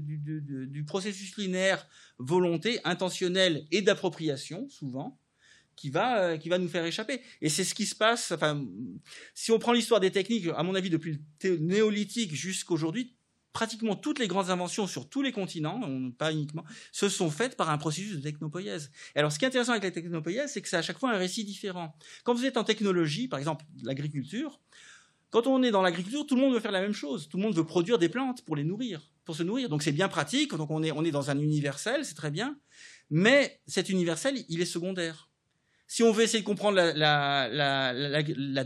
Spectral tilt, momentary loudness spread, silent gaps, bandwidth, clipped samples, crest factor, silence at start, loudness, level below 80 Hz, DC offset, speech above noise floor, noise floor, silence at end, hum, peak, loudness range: -4.5 dB/octave; 12 LU; none; 13 kHz; under 0.1%; 22 dB; 0 s; -29 LUFS; -82 dBFS; under 0.1%; 44 dB; -74 dBFS; 0 s; none; -8 dBFS; 4 LU